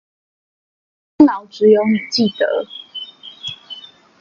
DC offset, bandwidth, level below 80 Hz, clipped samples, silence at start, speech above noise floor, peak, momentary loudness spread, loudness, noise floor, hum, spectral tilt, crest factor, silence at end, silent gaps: under 0.1%; 7.4 kHz; -60 dBFS; under 0.1%; 1.2 s; 22 dB; 0 dBFS; 19 LU; -15 LUFS; -38 dBFS; none; -5.5 dB/octave; 18 dB; 0.4 s; none